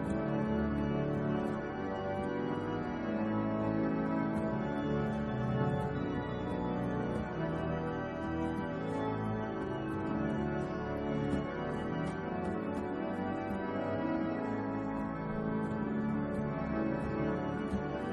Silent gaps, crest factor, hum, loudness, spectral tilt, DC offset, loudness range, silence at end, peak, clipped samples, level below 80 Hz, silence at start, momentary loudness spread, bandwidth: none; 16 dB; none; -35 LUFS; -8.5 dB/octave; under 0.1%; 2 LU; 0 s; -20 dBFS; under 0.1%; -52 dBFS; 0 s; 4 LU; 11 kHz